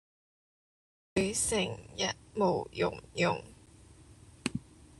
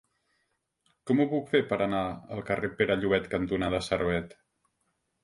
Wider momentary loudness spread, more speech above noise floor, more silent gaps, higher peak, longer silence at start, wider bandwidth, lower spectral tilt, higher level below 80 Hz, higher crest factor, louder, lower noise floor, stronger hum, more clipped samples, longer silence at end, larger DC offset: about the same, 9 LU vs 8 LU; second, 24 dB vs 49 dB; neither; about the same, -12 dBFS vs -10 dBFS; about the same, 1.15 s vs 1.05 s; about the same, 12.5 kHz vs 11.5 kHz; second, -3.5 dB/octave vs -6.5 dB/octave; second, -58 dBFS vs -52 dBFS; about the same, 24 dB vs 20 dB; second, -33 LUFS vs -29 LUFS; second, -56 dBFS vs -77 dBFS; neither; neither; second, 0.4 s vs 0.95 s; neither